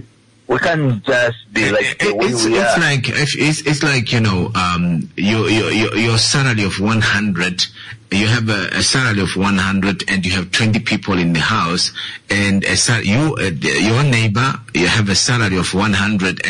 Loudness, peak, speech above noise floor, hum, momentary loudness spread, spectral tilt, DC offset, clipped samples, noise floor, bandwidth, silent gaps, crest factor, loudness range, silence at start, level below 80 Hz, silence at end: -15 LUFS; -4 dBFS; 24 dB; none; 4 LU; -4 dB/octave; under 0.1%; under 0.1%; -40 dBFS; 11 kHz; none; 12 dB; 1 LU; 0.5 s; -44 dBFS; 0 s